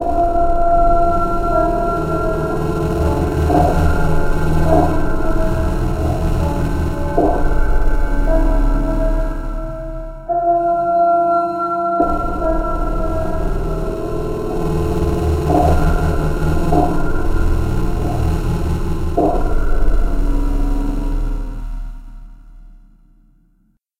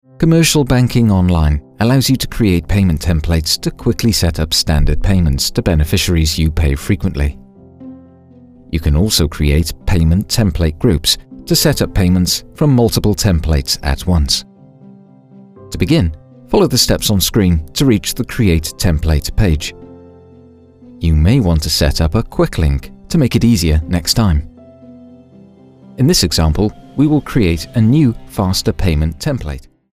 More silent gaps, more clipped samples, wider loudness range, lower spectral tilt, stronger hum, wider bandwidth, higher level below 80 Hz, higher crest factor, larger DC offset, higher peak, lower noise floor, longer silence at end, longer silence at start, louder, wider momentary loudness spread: neither; neither; about the same, 4 LU vs 3 LU; first, -8 dB/octave vs -5 dB/octave; neither; second, 14.5 kHz vs 16 kHz; first, -18 dBFS vs -24 dBFS; about the same, 14 dB vs 14 dB; neither; about the same, 0 dBFS vs 0 dBFS; first, -59 dBFS vs -42 dBFS; first, 1.3 s vs 0.3 s; second, 0 s vs 0.2 s; second, -18 LUFS vs -14 LUFS; about the same, 8 LU vs 6 LU